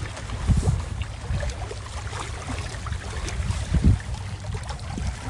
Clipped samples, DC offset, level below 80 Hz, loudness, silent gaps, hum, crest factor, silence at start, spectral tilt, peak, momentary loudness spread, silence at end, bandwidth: under 0.1%; under 0.1%; -30 dBFS; -28 LUFS; none; none; 20 dB; 0 s; -5.5 dB/octave; -6 dBFS; 11 LU; 0 s; 11.5 kHz